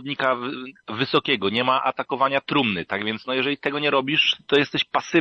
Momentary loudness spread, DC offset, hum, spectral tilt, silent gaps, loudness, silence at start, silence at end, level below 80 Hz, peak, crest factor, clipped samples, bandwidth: 7 LU; under 0.1%; none; -5 dB/octave; none; -22 LUFS; 0 s; 0 s; -64 dBFS; -6 dBFS; 18 dB; under 0.1%; 7.8 kHz